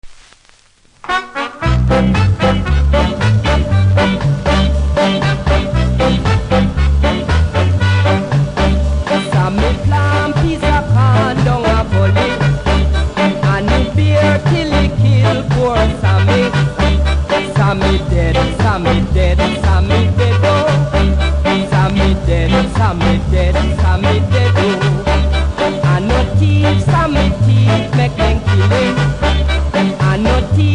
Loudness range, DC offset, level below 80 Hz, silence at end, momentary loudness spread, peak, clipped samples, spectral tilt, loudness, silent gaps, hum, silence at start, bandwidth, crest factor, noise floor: 1 LU; under 0.1%; -18 dBFS; 0 s; 3 LU; -2 dBFS; under 0.1%; -7 dB/octave; -13 LUFS; none; none; 0.05 s; 10.5 kHz; 10 dB; -48 dBFS